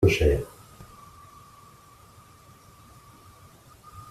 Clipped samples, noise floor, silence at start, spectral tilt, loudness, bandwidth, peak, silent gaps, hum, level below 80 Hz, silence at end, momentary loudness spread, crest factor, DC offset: under 0.1%; -52 dBFS; 0 s; -6 dB/octave; -25 LUFS; 14.5 kHz; -6 dBFS; none; none; -40 dBFS; 0.05 s; 28 LU; 24 dB; under 0.1%